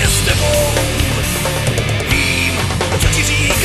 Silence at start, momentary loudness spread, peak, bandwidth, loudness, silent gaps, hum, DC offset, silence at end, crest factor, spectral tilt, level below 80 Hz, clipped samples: 0 s; 3 LU; 0 dBFS; 13.5 kHz; -14 LUFS; none; none; under 0.1%; 0 s; 14 dB; -3.5 dB/octave; -22 dBFS; under 0.1%